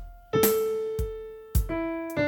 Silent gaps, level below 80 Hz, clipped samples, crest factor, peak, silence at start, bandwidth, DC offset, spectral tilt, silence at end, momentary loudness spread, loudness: none; -36 dBFS; under 0.1%; 20 dB; -8 dBFS; 0 s; 19 kHz; under 0.1%; -5 dB/octave; 0 s; 10 LU; -28 LUFS